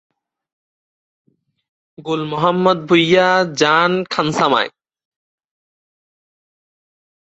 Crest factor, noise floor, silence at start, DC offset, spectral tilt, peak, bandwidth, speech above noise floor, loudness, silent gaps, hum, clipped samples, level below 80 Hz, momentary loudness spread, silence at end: 18 dB; under -90 dBFS; 2 s; under 0.1%; -5 dB/octave; -2 dBFS; 8.2 kHz; over 75 dB; -15 LUFS; none; none; under 0.1%; -60 dBFS; 10 LU; 2.7 s